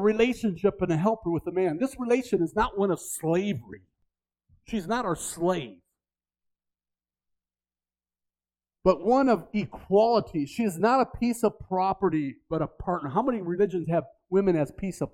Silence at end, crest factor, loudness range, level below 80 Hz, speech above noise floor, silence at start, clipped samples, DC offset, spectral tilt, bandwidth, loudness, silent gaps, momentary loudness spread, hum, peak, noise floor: 0.05 s; 20 dB; 8 LU; -52 dBFS; over 64 dB; 0 s; under 0.1%; under 0.1%; -6 dB/octave; 16.5 kHz; -27 LUFS; none; 9 LU; none; -8 dBFS; under -90 dBFS